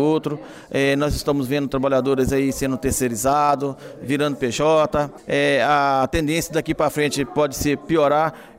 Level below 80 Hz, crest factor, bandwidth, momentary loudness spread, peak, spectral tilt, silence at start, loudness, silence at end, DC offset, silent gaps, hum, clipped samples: -40 dBFS; 14 dB; 16 kHz; 6 LU; -6 dBFS; -5 dB/octave; 0 s; -20 LUFS; 0.1 s; under 0.1%; none; none; under 0.1%